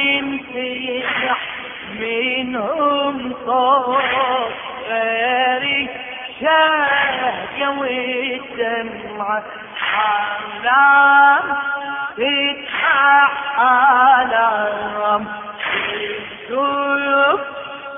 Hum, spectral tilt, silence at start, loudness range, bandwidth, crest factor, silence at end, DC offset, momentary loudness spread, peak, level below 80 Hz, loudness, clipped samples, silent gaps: none; -6.5 dB/octave; 0 s; 6 LU; 3.8 kHz; 16 dB; 0 s; under 0.1%; 13 LU; -2 dBFS; -58 dBFS; -17 LUFS; under 0.1%; none